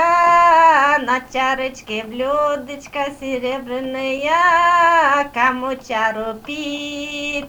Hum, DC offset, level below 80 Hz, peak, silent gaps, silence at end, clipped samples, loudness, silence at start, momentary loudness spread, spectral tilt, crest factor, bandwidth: none; under 0.1%; -50 dBFS; -2 dBFS; none; 0 s; under 0.1%; -17 LUFS; 0 s; 14 LU; -3 dB/octave; 16 dB; over 20 kHz